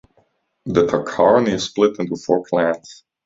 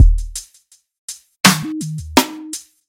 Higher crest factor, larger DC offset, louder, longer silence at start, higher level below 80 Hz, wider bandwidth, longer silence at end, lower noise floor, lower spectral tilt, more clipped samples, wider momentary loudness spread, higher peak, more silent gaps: about the same, 18 dB vs 18 dB; neither; about the same, -18 LUFS vs -16 LUFS; first, 0.65 s vs 0 s; second, -52 dBFS vs -22 dBFS; second, 7.8 kHz vs 17 kHz; about the same, 0.3 s vs 0.3 s; first, -62 dBFS vs -54 dBFS; first, -5.5 dB/octave vs -3.5 dB/octave; neither; second, 9 LU vs 19 LU; about the same, -2 dBFS vs 0 dBFS; second, none vs 0.98-1.08 s